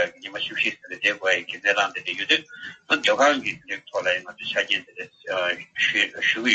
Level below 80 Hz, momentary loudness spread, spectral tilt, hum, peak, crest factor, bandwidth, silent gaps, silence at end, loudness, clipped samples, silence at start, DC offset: -70 dBFS; 10 LU; -1.5 dB/octave; none; -4 dBFS; 20 dB; 8.4 kHz; none; 0 s; -23 LUFS; under 0.1%; 0 s; under 0.1%